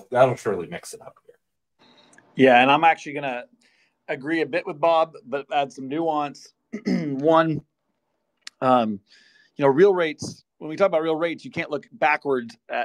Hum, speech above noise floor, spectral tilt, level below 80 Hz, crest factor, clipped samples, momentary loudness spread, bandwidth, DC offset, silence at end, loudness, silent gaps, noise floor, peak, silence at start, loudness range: none; 54 dB; -5.5 dB/octave; -70 dBFS; 20 dB; under 0.1%; 18 LU; 12 kHz; under 0.1%; 0 s; -22 LUFS; none; -75 dBFS; -2 dBFS; 0.1 s; 4 LU